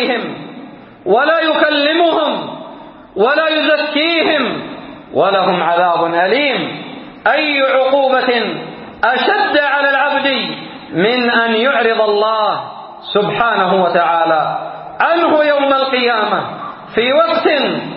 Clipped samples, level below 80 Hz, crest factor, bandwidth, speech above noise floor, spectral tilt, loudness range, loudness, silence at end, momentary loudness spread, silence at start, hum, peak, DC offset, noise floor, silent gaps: under 0.1%; -58 dBFS; 14 dB; 5.6 kHz; 21 dB; -9 dB/octave; 2 LU; -13 LUFS; 0 s; 14 LU; 0 s; none; 0 dBFS; under 0.1%; -34 dBFS; none